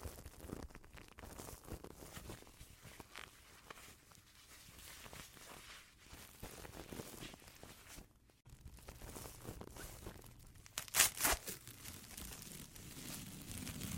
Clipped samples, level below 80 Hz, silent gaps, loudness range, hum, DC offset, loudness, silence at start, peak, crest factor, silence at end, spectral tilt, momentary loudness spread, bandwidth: under 0.1%; -60 dBFS; none; 16 LU; none; under 0.1%; -44 LUFS; 0 s; -10 dBFS; 36 dB; 0 s; -1.5 dB/octave; 18 LU; 16.5 kHz